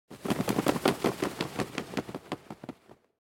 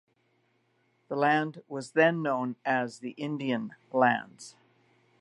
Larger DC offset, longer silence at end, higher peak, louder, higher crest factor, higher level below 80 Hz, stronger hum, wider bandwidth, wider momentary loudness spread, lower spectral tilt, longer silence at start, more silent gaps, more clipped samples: neither; second, 0.5 s vs 0.7 s; about the same, -8 dBFS vs -10 dBFS; second, -32 LUFS vs -29 LUFS; about the same, 24 dB vs 22 dB; first, -60 dBFS vs -84 dBFS; neither; first, 17 kHz vs 11.5 kHz; first, 17 LU vs 13 LU; about the same, -5 dB/octave vs -6 dB/octave; second, 0.1 s vs 1.1 s; neither; neither